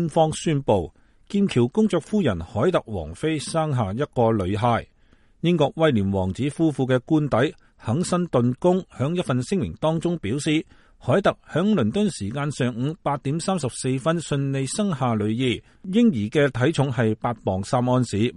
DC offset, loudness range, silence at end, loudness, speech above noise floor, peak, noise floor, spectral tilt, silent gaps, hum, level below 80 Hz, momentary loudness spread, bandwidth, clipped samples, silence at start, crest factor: under 0.1%; 2 LU; 0 s; -23 LUFS; 34 dB; -6 dBFS; -56 dBFS; -6.5 dB/octave; none; none; -50 dBFS; 6 LU; 11.5 kHz; under 0.1%; 0 s; 16 dB